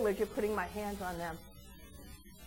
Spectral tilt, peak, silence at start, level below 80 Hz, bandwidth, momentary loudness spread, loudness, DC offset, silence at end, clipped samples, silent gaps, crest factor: -5 dB/octave; -22 dBFS; 0 s; -54 dBFS; 17 kHz; 19 LU; -37 LUFS; under 0.1%; 0 s; under 0.1%; none; 18 dB